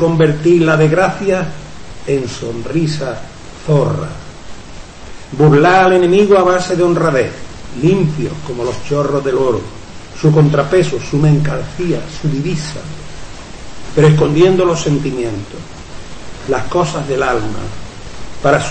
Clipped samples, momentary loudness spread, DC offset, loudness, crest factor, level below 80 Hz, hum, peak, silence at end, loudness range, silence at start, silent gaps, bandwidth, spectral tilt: under 0.1%; 22 LU; under 0.1%; -14 LUFS; 12 dB; -36 dBFS; none; 0 dBFS; 0 s; 7 LU; 0 s; none; 8.8 kHz; -6.5 dB/octave